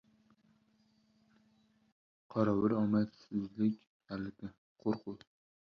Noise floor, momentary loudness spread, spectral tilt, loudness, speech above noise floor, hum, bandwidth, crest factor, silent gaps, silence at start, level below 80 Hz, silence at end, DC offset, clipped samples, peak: -72 dBFS; 18 LU; -9.5 dB/octave; -36 LUFS; 38 dB; 50 Hz at -70 dBFS; 6.2 kHz; 20 dB; 3.87-4.00 s, 4.58-4.75 s; 2.3 s; -70 dBFS; 0.6 s; under 0.1%; under 0.1%; -18 dBFS